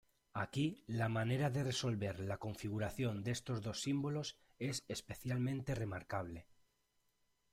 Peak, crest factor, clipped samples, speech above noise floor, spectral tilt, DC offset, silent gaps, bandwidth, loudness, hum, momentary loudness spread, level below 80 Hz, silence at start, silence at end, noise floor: -24 dBFS; 18 dB; under 0.1%; 40 dB; -5.5 dB/octave; under 0.1%; none; 16 kHz; -41 LUFS; none; 8 LU; -66 dBFS; 0.35 s; 1.1 s; -80 dBFS